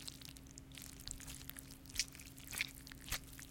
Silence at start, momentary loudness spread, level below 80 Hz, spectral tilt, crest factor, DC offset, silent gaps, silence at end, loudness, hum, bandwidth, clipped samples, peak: 0 s; 12 LU; -58 dBFS; -1.5 dB/octave; 30 dB; under 0.1%; none; 0 s; -46 LUFS; none; 17 kHz; under 0.1%; -20 dBFS